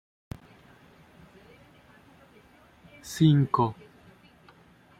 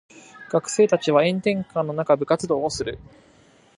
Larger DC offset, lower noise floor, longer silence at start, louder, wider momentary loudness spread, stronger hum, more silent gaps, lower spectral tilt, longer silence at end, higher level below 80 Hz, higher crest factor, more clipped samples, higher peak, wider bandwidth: neither; about the same, -57 dBFS vs -55 dBFS; first, 3.05 s vs 0.15 s; about the same, -24 LUFS vs -22 LUFS; first, 25 LU vs 9 LU; neither; neither; first, -7 dB/octave vs -5 dB/octave; first, 1.25 s vs 0.75 s; second, -62 dBFS vs -54 dBFS; about the same, 22 dB vs 18 dB; neither; second, -10 dBFS vs -4 dBFS; first, 15 kHz vs 11 kHz